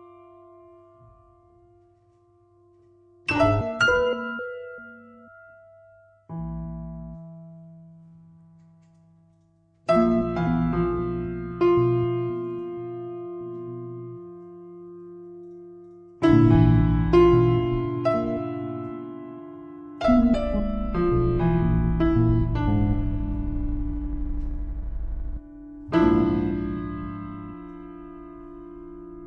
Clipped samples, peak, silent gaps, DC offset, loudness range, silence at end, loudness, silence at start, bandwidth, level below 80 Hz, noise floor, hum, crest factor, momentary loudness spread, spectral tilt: under 0.1%; -6 dBFS; none; under 0.1%; 18 LU; 0 s; -24 LUFS; 0 s; 9 kHz; -34 dBFS; -62 dBFS; none; 20 dB; 22 LU; -8.5 dB/octave